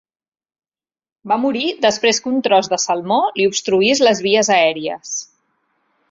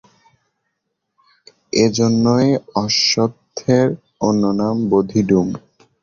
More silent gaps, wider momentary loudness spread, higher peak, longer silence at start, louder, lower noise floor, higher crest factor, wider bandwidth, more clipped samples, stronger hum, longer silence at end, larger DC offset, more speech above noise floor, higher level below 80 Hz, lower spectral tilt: neither; first, 10 LU vs 7 LU; about the same, 0 dBFS vs -2 dBFS; second, 1.25 s vs 1.75 s; about the same, -16 LUFS vs -17 LUFS; first, under -90 dBFS vs -75 dBFS; about the same, 18 dB vs 16 dB; about the same, 7.8 kHz vs 7.4 kHz; neither; neither; first, 0.85 s vs 0.45 s; neither; first, over 74 dB vs 59 dB; second, -62 dBFS vs -52 dBFS; second, -2.5 dB/octave vs -5 dB/octave